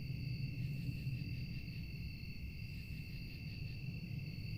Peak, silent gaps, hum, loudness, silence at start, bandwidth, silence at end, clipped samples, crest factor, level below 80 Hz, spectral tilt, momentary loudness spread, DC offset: -28 dBFS; none; none; -45 LUFS; 0 s; 16.5 kHz; 0 s; under 0.1%; 14 dB; -52 dBFS; -7 dB/octave; 5 LU; under 0.1%